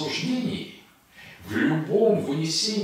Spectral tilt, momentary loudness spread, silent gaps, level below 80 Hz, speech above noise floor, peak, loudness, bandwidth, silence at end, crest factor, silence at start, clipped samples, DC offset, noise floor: -4.5 dB/octave; 13 LU; none; -64 dBFS; 26 dB; -10 dBFS; -25 LUFS; 16 kHz; 0 s; 16 dB; 0 s; under 0.1%; under 0.1%; -50 dBFS